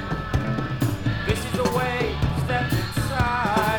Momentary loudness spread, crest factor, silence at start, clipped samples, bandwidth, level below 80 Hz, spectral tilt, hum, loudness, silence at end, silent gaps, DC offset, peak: 4 LU; 16 dB; 0 s; under 0.1%; 19 kHz; -34 dBFS; -6 dB/octave; none; -24 LUFS; 0 s; none; under 0.1%; -8 dBFS